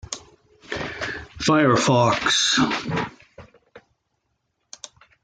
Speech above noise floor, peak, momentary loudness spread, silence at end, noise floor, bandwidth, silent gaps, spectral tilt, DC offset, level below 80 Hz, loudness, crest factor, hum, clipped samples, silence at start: 55 dB; -6 dBFS; 22 LU; 1.45 s; -74 dBFS; 10 kHz; none; -3.5 dB/octave; under 0.1%; -52 dBFS; -20 LUFS; 18 dB; none; under 0.1%; 0.1 s